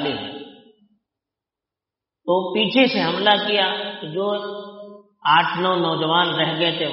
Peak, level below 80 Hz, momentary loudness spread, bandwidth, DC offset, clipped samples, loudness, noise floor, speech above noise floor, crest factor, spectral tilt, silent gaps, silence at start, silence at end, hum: -2 dBFS; -68 dBFS; 16 LU; 5.8 kHz; under 0.1%; under 0.1%; -19 LUFS; -87 dBFS; 68 dB; 20 dB; -2 dB/octave; none; 0 s; 0 s; none